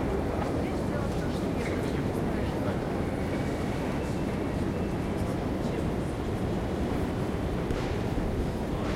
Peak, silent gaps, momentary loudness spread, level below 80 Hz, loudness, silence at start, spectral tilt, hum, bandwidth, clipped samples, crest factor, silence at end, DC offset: -16 dBFS; none; 1 LU; -38 dBFS; -31 LUFS; 0 s; -7 dB/octave; none; 16.5 kHz; under 0.1%; 14 dB; 0 s; under 0.1%